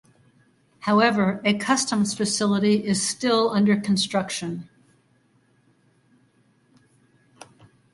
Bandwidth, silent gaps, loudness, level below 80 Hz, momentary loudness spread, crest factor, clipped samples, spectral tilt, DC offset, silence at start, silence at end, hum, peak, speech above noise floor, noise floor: 11.5 kHz; none; -22 LUFS; -64 dBFS; 9 LU; 20 dB; under 0.1%; -4 dB/octave; under 0.1%; 0.8 s; 3.3 s; none; -4 dBFS; 41 dB; -63 dBFS